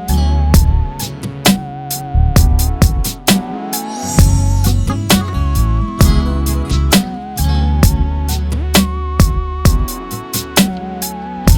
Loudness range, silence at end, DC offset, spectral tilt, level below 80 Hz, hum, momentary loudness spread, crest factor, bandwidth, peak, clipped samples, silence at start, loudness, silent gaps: 1 LU; 0 s; under 0.1%; -5 dB/octave; -16 dBFS; none; 9 LU; 12 dB; over 20 kHz; 0 dBFS; under 0.1%; 0 s; -15 LUFS; none